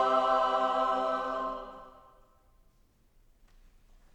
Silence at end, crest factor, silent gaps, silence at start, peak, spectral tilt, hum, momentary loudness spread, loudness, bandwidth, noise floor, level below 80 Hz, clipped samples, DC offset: 2.25 s; 18 dB; none; 0 s; -16 dBFS; -4 dB/octave; none; 18 LU; -29 LUFS; 11.5 kHz; -65 dBFS; -60 dBFS; under 0.1%; under 0.1%